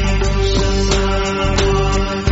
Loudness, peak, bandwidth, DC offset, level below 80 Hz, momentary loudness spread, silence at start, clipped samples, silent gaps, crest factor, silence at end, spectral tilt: -16 LUFS; -2 dBFS; 8 kHz; under 0.1%; -18 dBFS; 2 LU; 0 s; under 0.1%; none; 12 dB; 0 s; -5 dB/octave